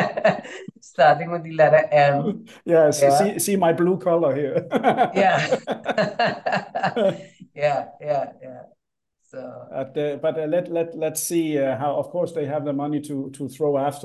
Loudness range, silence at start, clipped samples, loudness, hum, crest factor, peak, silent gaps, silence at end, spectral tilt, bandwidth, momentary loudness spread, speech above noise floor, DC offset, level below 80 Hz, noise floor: 9 LU; 0 s; under 0.1%; -21 LUFS; none; 18 dB; -4 dBFS; none; 0 s; -5 dB/octave; 13 kHz; 16 LU; 53 dB; under 0.1%; -68 dBFS; -74 dBFS